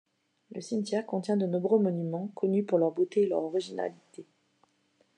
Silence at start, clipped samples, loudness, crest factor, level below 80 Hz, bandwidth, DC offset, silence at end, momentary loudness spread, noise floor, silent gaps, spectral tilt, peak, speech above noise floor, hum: 0.5 s; under 0.1%; -29 LUFS; 18 dB; under -90 dBFS; 10 kHz; under 0.1%; 0.95 s; 10 LU; -70 dBFS; none; -7.5 dB/octave; -12 dBFS; 41 dB; none